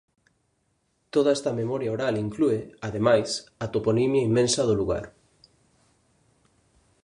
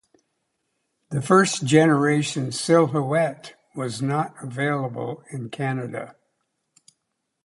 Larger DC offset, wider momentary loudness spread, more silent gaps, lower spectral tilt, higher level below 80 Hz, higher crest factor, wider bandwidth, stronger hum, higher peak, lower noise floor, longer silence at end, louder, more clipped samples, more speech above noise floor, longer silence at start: neither; second, 9 LU vs 16 LU; neither; about the same, -5.5 dB/octave vs -5.5 dB/octave; first, -54 dBFS vs -66 dBFS; about the same, 20 dB vs 20 dB; about the same, 11.5 kHz vs 11.5 kHz; neither; second, -6 dBFS vs -2 dBFS; second, -72 dBFS vs -77 dBFS; first, 1.95 s vs 1.35 s; second, -25 LUFS vs -22 LUFS; neither; second, 47 dB vs 56 dB; about the same, 1.15 s vs 1.1 s